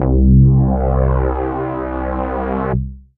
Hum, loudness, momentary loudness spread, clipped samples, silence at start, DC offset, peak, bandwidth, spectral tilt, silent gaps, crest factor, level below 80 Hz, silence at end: none; -16 LUFS; 11 LU; under 0.1%; 0 s; under 0.1%; -2 dBFS; 3.1 kHz; -14 dB/octave; none; 12 dB; -20 dBFS; 0.2 s